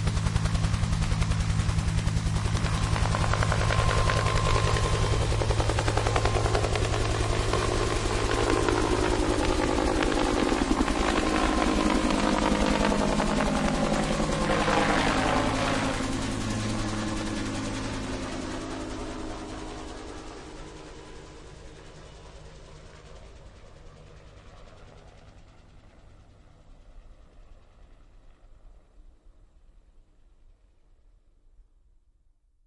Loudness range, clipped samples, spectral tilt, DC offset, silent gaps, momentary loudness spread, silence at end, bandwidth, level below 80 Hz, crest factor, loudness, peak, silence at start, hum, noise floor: 17 LU; under 0.1%; -5 dB/octave; under 0.1%; none; 19 LU; 2.65 s; 11.5 kHz; -34 dBFS; 22 dB; -27 LUFS; -6 dBFS; 0 s; none; -64 dBFS